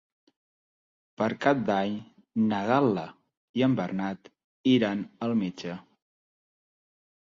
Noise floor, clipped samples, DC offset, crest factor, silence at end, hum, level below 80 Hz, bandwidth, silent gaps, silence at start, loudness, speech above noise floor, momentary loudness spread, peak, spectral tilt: under -90 dBFS; under 0.1%; under 0.1%; 20 dB; 1.4 s; none; -68 dBFS; 7.4 kHz; 3.37-3.54 s, 4.44-4.64 s; 1.2 s; -27 LUFS; over 64 dB; 14 LU; -8 dBFS; -7 dB/octave